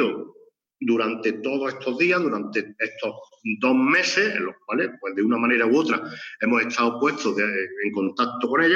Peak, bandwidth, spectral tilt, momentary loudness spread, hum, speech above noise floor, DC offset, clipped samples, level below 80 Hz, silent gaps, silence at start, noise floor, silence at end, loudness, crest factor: -8 dBFS; 7.6 kHz; -4.5 dB/octave; 10 LU; none; 27 dB; under 0.1%; under 0.1%; -82 dBFS; none; 0 s; -50 dBFS; 0 s; -23 LUFS; 16 dB